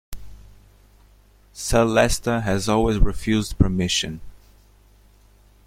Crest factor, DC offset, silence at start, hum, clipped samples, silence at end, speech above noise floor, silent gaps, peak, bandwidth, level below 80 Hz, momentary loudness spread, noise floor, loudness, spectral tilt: 20 dB; under 0.1%; 0.1 s; 50 Hz at -45 dBFS; under 0.1%; 1.3 s; 34 dB; none; -2 dBFS; 16 kHz; -30 dBFS; 20 LU; -53 dBFS; -21 LUFS; -5 dB/octave